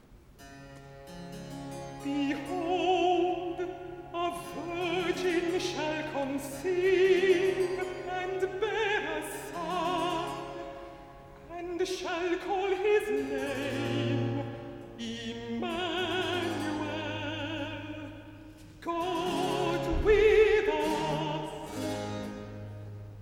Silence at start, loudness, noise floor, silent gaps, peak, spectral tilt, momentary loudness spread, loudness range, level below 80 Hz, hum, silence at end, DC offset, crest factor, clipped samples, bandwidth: 0.1 s; -30 LUFS; -53 dBFS; none; -12 dBFS; -5 dB/octave; 18 LU; 6 LU; -50 dBFS; none; 0 s; under 0.1%; 18 dB; under 0.1%; 17 kHz